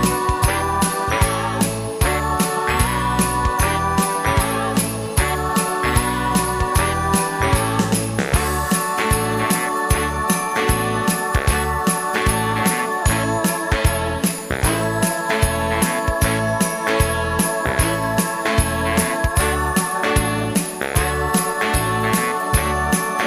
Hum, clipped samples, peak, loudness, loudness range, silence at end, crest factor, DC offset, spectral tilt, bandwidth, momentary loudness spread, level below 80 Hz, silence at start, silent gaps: none; under 0.1%; -2 dBFS; -19 LUFS; 0 LU; 0 s; 16 dB; under 0.1%; -4 dB/octave; 15.5 kHz; 2 LU; -28 dBFS; 0 s; none